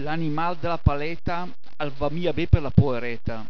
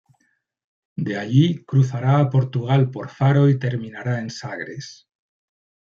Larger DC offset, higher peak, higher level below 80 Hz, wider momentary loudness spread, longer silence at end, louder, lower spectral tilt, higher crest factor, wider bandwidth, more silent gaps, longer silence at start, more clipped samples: first, 5% vs under 0.1%; first, 0 dBFS vs -4 dBFS; first, -34 dBFS vs -60 dBFS; about the same, 12 LU vs 14 LU; second, 0 s vs 1.05 s; second, -25 LUFS vs -20 LUFS; about the same, -9 dB/octave vs -8 dB/octave; first, 24 dB vs 16 dB; second, 5.4 kHz vs 7.2 kHz; neither; second, 0 s vs 1 s; neither